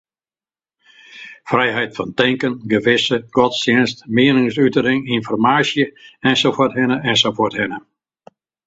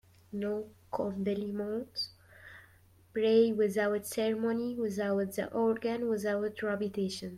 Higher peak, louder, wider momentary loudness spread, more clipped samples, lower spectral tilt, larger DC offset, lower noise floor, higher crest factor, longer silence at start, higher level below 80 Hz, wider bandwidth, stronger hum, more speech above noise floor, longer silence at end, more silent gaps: first, 0 dBFS vs -14 dBFS; first, -16 LUFS vs -32 LUFS; second, 8 LU vs 12 LU; neither; about the same, -5 dB/octave vs -5.5 dB/octave; neither; first, under -90 dBFS vs -61 dBFS; about the same, 18 dB vs 18 dB; first, 1.15 s vs 0.3 s; first, -56 dBFS vs -70 dBFS; second, 8 kHz vs 16 kHz; neither; first, over 73 dB vs 30 dB; first, 0.85 s vs 0 s; neither